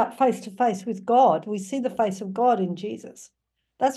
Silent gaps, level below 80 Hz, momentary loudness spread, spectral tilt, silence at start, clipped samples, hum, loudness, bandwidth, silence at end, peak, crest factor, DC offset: none; -74 dBFS; 14 LU; -6 dB/octave; 0 s; under 0.1%; none; -24 LUFS; 12.5 kHz; 0 s; -8 dBFS; 16 dB; under 0.1%